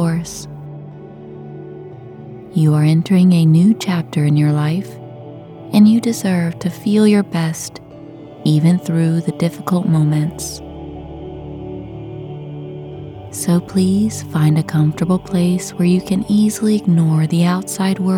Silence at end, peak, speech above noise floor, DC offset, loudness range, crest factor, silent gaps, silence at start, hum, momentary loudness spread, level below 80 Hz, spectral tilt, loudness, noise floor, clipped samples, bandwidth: 0 s; 0 dBFS; 21 dB; under 0.1%; 7 LU; 16 dB; none; 0 s; none; 21 LU; -46 dBFS; -7 dB/octave; -16 LUFS; -35 dBFS; under 0.1%; 16 kHz